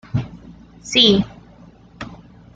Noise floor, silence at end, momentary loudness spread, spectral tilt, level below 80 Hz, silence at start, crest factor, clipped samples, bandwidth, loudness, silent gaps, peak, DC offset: -45 dBFS; 0.4 s; 24 LU; -4.5 dB/octave; -44 dBFS; 0.15 s; 20 dB; under 0.1%; 9 kHz; -15 LUFS; none; 0 dBFS; under 0.1%